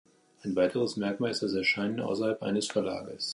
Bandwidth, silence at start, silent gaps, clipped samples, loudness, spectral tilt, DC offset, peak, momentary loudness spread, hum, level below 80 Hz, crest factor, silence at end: 11.5 kHz; 0.45 s; none; under 0.1%; -30 LUFS; -4.5 dB/octave; under 0.1%; -14 dBFS; 7 LU; none; -66 dBFS; 16 dB; 0 s